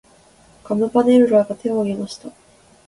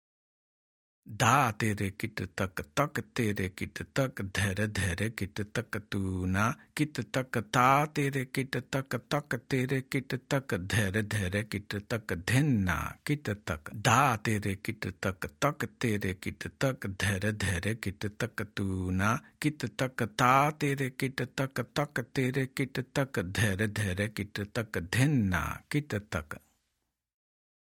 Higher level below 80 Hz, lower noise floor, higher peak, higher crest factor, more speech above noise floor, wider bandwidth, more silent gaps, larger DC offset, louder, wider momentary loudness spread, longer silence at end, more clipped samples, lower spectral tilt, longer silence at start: about the same, -58 dBFS vs -58 dBFS; second, -51 dBFS vs -83 dBFS; first, -2 dBFS vs -8 dBFS; second, 18 dB vs 24 dB; second, 34 dB vs 52 dB; second, 11.5 kHz vs 18 kHz; neither; neither; first, -17 LUFS vs -31 LUFS; first, 15 LU vs 10 LU; second, 0.6 s vs 1.3 s; neither; first, -7 dB/octave vs -5.5 dB/octave; second, 0.65 s vs 1.05 s